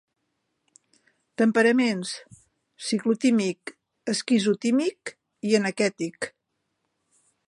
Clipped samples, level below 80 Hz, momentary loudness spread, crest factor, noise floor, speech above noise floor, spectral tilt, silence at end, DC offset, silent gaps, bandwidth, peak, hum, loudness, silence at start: under 0.1%; -76 dBFS; 18 LU; 18 dB; -77 dBFS; 54 dB; -4.5 dB/octave; 1.2 s; under 0.1%; none; 11 kHz; -8 dBFS; none; -24 LUFS; 1.4 s